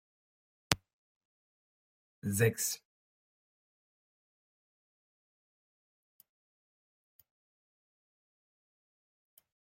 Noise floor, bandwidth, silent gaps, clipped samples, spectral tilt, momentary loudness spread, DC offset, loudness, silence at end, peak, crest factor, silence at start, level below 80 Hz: under -90 dBFS; 16 kHz; 0.93-2.22 s; under 0.1%; -3.5 dB/octave; 12 LU; under 0.1%; -34 LUFS; 7.05 s; -4 dBFS; 38 dB; 0.7 s; -70 dBFS